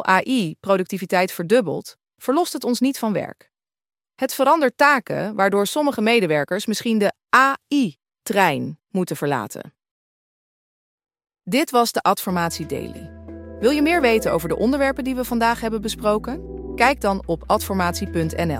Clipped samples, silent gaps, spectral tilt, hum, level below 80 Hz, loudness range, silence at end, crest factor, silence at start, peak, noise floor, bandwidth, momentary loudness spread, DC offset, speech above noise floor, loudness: under 0.1%; 9.91-10.98 s; -4.5 dB/octave; none; -46 dBFS; 5 LU; 0 s; 20 dB; 0 s; -2 dBFS; under -90 dBFS; 16.5 kHz; 12 LU; under 0.1%; over 70 dB; -20 LUFS